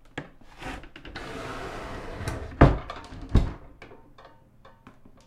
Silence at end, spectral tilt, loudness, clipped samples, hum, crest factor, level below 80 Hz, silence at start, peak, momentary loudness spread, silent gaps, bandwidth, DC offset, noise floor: 0.15 s; -7.5 dB/octave; -28 LUFS; under 0.1%; none; 28 dB; -34 dBFS; 0.05 s; 0 dBFS; 25 LU; none; 12.5 kHz; under 0.1%; -54 dBFS